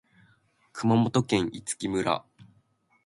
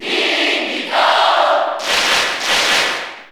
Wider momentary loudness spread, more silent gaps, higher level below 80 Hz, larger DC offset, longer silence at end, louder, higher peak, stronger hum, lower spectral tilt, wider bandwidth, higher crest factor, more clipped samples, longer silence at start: first, 9 LU vs 5 LU; neither; second, -60 dBFS vs -54 dBFS; neither; first, 0.65 s vs 0.05 s; second, -27 LUFS vs -14 LUFS; second, -8 dBFS vs -2 dBFS; neither; first, -5.5 dB/octave vs 0 dB/octave; second, 11.5 kHz vs over 20 kHz; first, 20 dB vs 14 dB; neither; first, 0.75 s vs 0 s